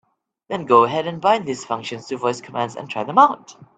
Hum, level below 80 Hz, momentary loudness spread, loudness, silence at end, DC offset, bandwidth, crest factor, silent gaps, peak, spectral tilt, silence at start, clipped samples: none; -66 dBFS; 14 LU; -20 LUFS; 0.15 s; under 0.1%; 9 kHz; 20 dB; none; 0 dBFS; -5 dB/octave; 0.5 s; under 0.1%